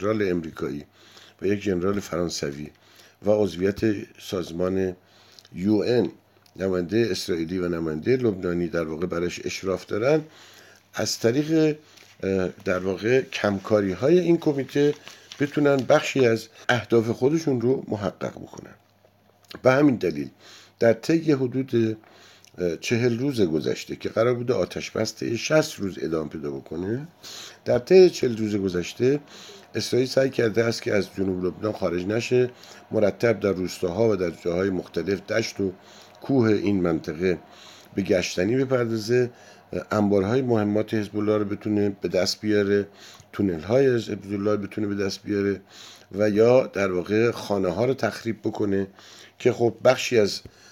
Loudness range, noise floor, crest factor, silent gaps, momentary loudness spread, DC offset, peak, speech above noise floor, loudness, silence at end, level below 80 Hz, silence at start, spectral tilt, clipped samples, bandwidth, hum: 4 LU; -59 dBFS; 20 dB; none; 11 LU; under 0.1%; -4 dBFS; 36 dB; -24 LUFS; 0.3 s; -58 dBFS; 0 s; -6 dB/octave; under 0.1%; 16 kHz; none